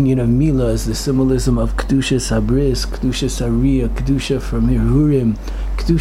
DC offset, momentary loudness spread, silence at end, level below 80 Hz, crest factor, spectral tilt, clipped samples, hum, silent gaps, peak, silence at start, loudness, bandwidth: under 0.1%; 5 LU; 0 s; -22 dBFS; 12 dB; -6.5 dB/octave; under 0.1%; none; none; -4 dBFS; 0 s; -17 LUFS; 14.5 kHz